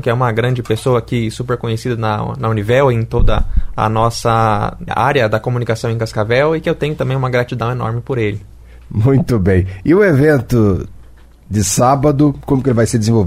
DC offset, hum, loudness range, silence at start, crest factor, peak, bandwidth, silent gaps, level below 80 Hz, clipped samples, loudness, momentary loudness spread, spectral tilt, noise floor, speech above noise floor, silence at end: under 0.1%; none; 3 LU; 0 s; 12 dB; -2 dBFS; 15.5 kHz; none; -26 dBFS; under 0.1%; -15 LUFS; 7 LU; -6.5 dB/octave; -39 dBFS; 25 dB; 0 s